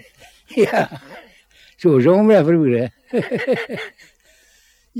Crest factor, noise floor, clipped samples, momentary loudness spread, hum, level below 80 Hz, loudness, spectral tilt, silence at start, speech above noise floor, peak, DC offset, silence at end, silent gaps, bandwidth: 16 dB; -56 dBFS; under 0.1%; 15 LU; none; -62 dBFS; -17 LUFS; -7.5 dB/octave; 0.5 s; 40 dB; -2 dBFS; under 0.1%; 0 s; none; 15 kHz